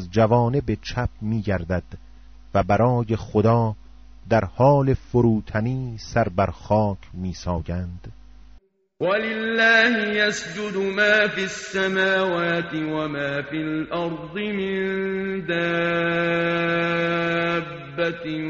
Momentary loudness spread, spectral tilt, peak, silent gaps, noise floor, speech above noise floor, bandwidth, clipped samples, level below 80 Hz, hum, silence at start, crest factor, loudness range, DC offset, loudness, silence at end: 10 LU; -4.5 dB/octave; -6 dBFS; none; -51 dBFS; 29 dB; 8 kHz; under 0.1%; -44 dBFS; none; 0 s; 16 dB; 5 LU; under 0.1%; -22 LUFS; 0 s